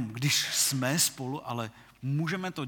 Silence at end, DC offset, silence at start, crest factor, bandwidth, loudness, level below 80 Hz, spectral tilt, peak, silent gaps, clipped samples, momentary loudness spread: 0 s; under 0.1%; 0 s; 18 dB; 19.5 kHz; -28 LUFS; -68 dBFS; -3 dB/octave; -12 dBFS; none; under 0.1%; 12 LU